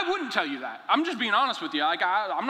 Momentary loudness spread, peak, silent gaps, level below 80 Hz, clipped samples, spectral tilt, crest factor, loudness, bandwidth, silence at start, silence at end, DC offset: 4 LU; -6 dBFS; none; -80 dBFS; under 0.1%; -3 dB/octave; 20 dB; -26 LUFS; 15 kHz; 0 s; 0 s; under 0.1%